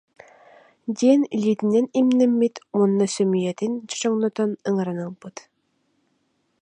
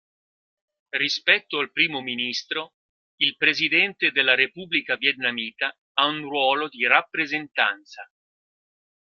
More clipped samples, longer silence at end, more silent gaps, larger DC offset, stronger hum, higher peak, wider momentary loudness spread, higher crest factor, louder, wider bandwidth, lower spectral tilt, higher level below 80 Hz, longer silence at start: neither; first, 1.3 s vs 0.95 s; second, none vs 2.74-3.18 s, 5.78-5.95 s; neither; neither; second, -6 dBFS vs -2 dBFS; first, 14 LU vs 9 LU; second, 18 dB vs 24 dB; about the same, -21 LUFS vs -22 LUFS; second, 10 kHz vs 13 kHz; first, -6 dB/octave vs -2.5 dB/octave; about the same, -74 dBFS vs -74 dBFS; about the same, 0.85 s vs 0.95 s